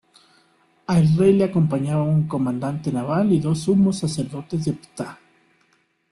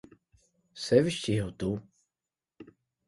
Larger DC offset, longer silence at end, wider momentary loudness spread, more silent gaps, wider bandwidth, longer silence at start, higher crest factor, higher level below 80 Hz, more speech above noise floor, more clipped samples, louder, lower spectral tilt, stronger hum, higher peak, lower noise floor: neither; first, 1 s vs 0.45 s; about the same, 13 LU vs 13 LU; neither; about the same, 11.5 kHz vs 11.5 kHz; first, 0.9 s vs 0.75 s; second, 16 dB vs 24 dB; about the same, -54 dBFS vs -58 dBFS; second, 44 dB vs over 62 dB; neither; first, -21 LUFS vs -29 LUFS; first, -7.5 dB/octave vs -6 dB/octave; neither; about the same, -6 dBFS vs -8 dBFS; second, -64 dBFS vs under -90 dBFS